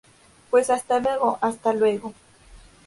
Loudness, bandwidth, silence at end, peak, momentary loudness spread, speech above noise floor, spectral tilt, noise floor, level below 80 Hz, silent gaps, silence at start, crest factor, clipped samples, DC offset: -22 LUFS; 11.5 kHz; 0.3 s; -6 dBFS; 5 LU; 28 dB; -4.5 dB/octave; -49 dBFS; -58 dBFS; none; 0.5 s; 18 dB; under 0.1%; under 0.1%